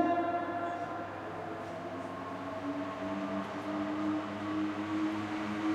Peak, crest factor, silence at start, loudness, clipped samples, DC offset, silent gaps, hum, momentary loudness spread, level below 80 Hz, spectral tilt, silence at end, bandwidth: -16 dBFS; 18 dB; 0 s; -36 LUFS; under 0.1%; under 0.1%; none; none; 7 LU; -70 dBFS; -6.5 dB/octave; 0 s; 10.5 kHz